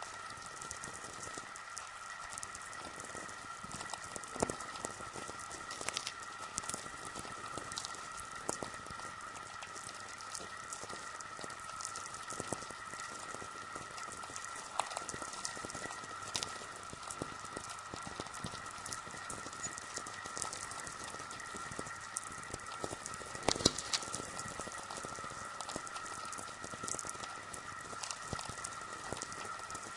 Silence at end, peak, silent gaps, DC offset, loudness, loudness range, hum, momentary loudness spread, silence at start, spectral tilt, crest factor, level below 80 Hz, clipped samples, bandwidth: 0 s; -6 dBFS; none; under 0.1%; -42 LUFS; 6 LU; none; 6 LU; 0 s; -2 dB/octave; 36 dB; -66 dBFS; under 0.1%; 11.5 kHz